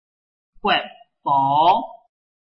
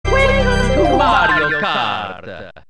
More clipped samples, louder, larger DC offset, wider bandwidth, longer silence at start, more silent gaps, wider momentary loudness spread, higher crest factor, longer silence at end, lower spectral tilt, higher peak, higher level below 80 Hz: neither; second, -19 LUFS vs -14 LUFS; neither; second, 5.8 kHz vs 10 kHz; first, 0.65 s vs 0.05 s; neither; first, 18 LU vs 14 LU; about the same, 16 dB vs 14 dB; first, 0.6 s vs 0.1 s; first, -7 dB/octave vs -5 dB/octave; second, -6 dBFS vs 0 dBFS; second, -58 dBFS vs -24 dBFS